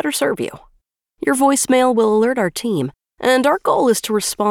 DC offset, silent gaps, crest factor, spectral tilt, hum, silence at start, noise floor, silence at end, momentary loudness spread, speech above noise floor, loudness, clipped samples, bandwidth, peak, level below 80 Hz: under 0.1%; none; 14 dB; -3.5 dB/octave; none; 0.05 s; -61 dBFS; 0 s; 9 LU; 45 dB; -17 LUFS; under 0.1%; 19.5 kHz; -4 dBFS; -56 dBFS